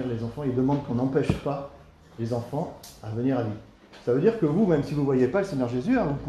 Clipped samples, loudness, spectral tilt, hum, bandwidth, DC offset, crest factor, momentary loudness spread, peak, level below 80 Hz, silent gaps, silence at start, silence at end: under 0.1%; -26 LUFS; -8.5 dB/octave; none; 13 kHz; under 0.1%; 18 dB; 12 LU; -8 dBFS; -50 dBFS; none; 0 s; 0 s